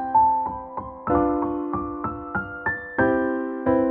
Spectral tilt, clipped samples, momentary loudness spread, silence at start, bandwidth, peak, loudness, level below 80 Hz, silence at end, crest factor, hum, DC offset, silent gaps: -7 dB/octave; under 0.1%; 9 LU; 0 s; 3.8 kHz; -8 dBFS; -24 LUFS; -46 dBFS; 0 s; 16 dB; none; under 0.1%; none